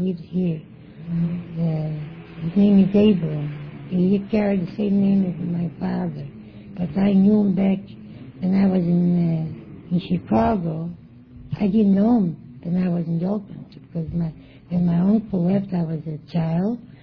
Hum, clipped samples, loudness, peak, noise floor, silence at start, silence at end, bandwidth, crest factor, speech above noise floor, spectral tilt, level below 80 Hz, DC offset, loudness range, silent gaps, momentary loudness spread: none; under 0.1%; -21 LUFS; -6 dBFS; -43 dBFS; 0 s; 0.1 s; 5.4 kHz; 14 dB; 23 dB; -11 dB/octave; -50 dBFS; under 0.1%; 3 LU; none; 16 LU